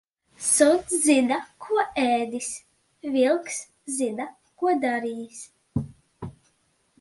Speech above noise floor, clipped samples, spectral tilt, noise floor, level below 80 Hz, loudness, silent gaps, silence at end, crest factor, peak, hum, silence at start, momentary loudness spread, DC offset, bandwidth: 44 dB; under 0.1%; -3.5 dB/octave; -68 dBFS; -58 dBFS; -24 LUFS; none; 0.7 s; 22 dB; -4 dBFS; none; 0.4 s; 20 LU; under 0.1%; 12 kHz